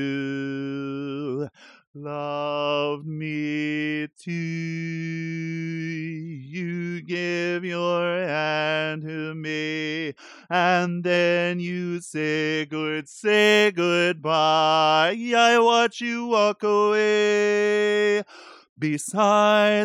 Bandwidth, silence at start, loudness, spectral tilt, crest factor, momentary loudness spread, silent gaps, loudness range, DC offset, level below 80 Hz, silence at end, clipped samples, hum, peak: 15.5 kHz; 0 s; -23 LUFS; -4.5 dB/octave; 16 dB; 13 LU; 1.87-1.94 s, 18.69-18.76 s; 9 LU; under 0.1%; -76 dBFS; 0 s; under 0.1%; none; -6 dBFS